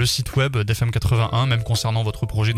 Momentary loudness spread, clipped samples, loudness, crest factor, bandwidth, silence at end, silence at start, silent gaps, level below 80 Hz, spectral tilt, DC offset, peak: 3 LU; under 0.1%; -21 LUFS; 14 dB; 15.5 kHz; 0 s; 0 s; none; -36 dBFS; -5 dB/octave; under 0.1%; -6 dBFS